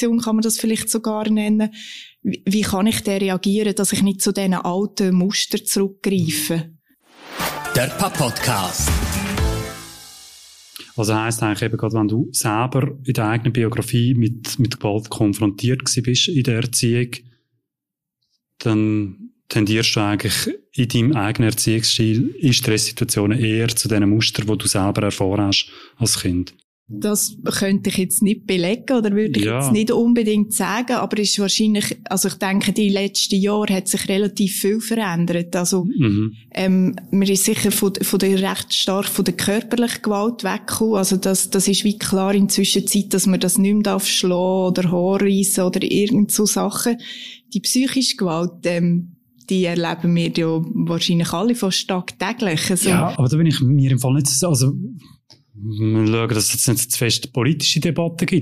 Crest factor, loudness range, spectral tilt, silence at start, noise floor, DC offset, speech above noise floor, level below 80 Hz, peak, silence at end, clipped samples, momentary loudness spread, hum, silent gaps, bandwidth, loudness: 14 dB; 4 LU; -4.5 dB/octave; 0 s; -85 dBFS; under 0.1%; 66 dB; -42 dBFS; -4 dBFS; 0 s; under 0.1%; 7 LU; none; 26.64-26.86 s; 15.5 kHz; -18 LUFS